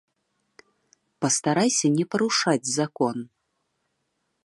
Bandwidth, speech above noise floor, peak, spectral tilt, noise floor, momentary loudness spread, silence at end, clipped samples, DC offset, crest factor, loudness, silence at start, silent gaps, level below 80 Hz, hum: 11.5 kHz; 52 dB; -6 dBFS; -3.5 dB/octave; -76 dBFS; 8 LU; 1.2 s; under 0.1%; under 0.1%; 20 dB; -23 LUFS; 1.2 s; none; -72 dBFS; none